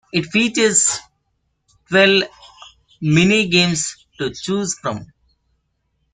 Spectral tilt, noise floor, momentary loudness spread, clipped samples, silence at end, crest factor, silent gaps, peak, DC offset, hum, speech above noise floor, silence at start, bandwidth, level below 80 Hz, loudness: -3.5 dB/octave; -69 dBFS; 13 LU; under 0.1%; 1.1 s; 18 dB; none; -2 dBFS; under 0.1%; none; 52 dB; 0.15 s; 9.8 kHz; -54 dBFS; -17 LUFS